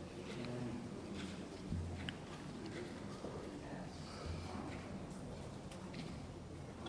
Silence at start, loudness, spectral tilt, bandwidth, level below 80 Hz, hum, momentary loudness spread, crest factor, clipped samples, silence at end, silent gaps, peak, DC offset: 0 s; -48 LUFS; -6 dB/octave; 11 kHz; -60 dBFS; none; 5 LU; 24 dB; under 0.1%; 0 s; none; -24 dBFS; under 0.1%